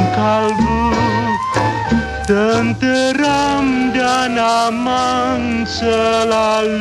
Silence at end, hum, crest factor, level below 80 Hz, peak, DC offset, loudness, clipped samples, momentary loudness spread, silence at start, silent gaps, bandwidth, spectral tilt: 0 s; none; 12 dB; -34 dBFS; -2 dBFS; under 0.1%; -15 LUFS; under 0.1%; 3 LU; 0 s; none; 12.5 kHz; -5 dB/octave